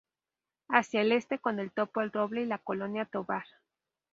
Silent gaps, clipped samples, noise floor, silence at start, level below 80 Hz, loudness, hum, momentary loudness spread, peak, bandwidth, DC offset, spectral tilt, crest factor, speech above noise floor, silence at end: none; under 0.1%; under -90 dBFS; 0.7 s; -78 dBFS; -31 LUFS; none; 8 LU; -8 dBFS; 7.8 kHz; under 0.1%; -5.5 dB/octave; 26 dB; over 59 dB; 0.7 s